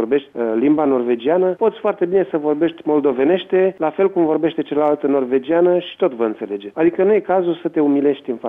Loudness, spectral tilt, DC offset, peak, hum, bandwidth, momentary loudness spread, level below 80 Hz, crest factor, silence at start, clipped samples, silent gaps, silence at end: -17 LUFS; -9 dB/octave; under 0.1%; -4 dBFS; none; 3.9 kHz; 5 LU; -64 dBFS; 14 dB; 0 s; under 0.1%; none; 0 s